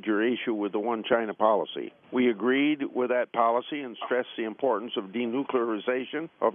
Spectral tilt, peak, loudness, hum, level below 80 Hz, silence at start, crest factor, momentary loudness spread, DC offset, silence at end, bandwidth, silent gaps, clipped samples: -2.5 dB/octave; -8 dBFS; -28 LUFS; none; -82 dBFS; 0.05 s; 18 dB; 8 LU; under 0.1%; 0 s; 3.7 kHz; none; under 0.1%